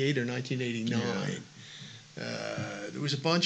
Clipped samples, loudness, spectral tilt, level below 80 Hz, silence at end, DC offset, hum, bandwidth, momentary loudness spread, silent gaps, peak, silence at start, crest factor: under 0.1%; -33 LUFS; -5 dB/octave; -76 dBFS; 0 s; under 0.1%; none; 9 kHz; 15 LU; none; -14 dBFS; 0 s; 20 dB